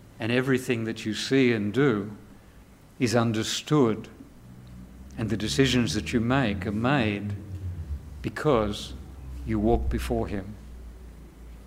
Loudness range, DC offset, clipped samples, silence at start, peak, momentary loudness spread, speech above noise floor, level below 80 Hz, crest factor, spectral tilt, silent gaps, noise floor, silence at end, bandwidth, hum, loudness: 3 LU; under 0.1%; under 0.1%; 0 s; -8 dBFS; 22 LU; 26 dB; -40 dBFS; 20 dB; -5.5 dB/octave; none; -51 dBFS; 0 s; 16 kHz; none; -26 LUFS